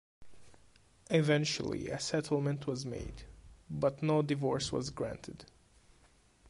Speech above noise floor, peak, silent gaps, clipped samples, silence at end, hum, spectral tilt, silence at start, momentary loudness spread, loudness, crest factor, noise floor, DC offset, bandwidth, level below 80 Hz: 32 dB; -16 dBFS; none; under 0.1%; 1.05 s; none; -5.5 dB/octave; 0.2 s; 16 LU; -34 LUFS; 18 dB; -65 dBFS; under 0.1%; 11.5 kHz; -58 dBFS